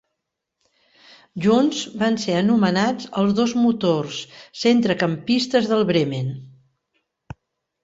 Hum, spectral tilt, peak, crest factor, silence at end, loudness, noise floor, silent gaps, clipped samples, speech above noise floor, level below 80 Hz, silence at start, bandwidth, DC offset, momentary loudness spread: none; -5.5 dB/octave; -4 dBFS; 16 dB; 1.35 s; -20 LUFS; -80 dBFS; none; under 0.1%; 60 dB; -60 dBFS; 1.35 s; 7.8 kHz; under 0.1%; 11 LU